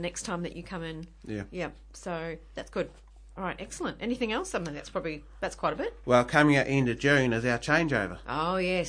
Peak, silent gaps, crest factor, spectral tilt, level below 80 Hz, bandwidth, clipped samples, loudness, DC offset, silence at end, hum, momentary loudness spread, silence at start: -8 dBFS; none; 22 dB; -5.5 dB/octave; -50 dBFS; 10.5 kHz; under 0.1%; -29 LUFS; under 0.1%; 0 s; none; 15 LU; 0 s